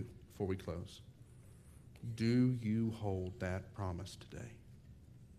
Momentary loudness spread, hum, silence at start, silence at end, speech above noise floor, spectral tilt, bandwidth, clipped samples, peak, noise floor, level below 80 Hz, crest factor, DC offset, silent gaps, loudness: 26 LU; none; 0 s; 0 s; 20 dB; -7.5 dB/octave; 14 kHz; under 0.1%; -22 dBFS; -59 dBFS; -64 dBFS; 18 dB; under 0.1%; none; -39 LUFS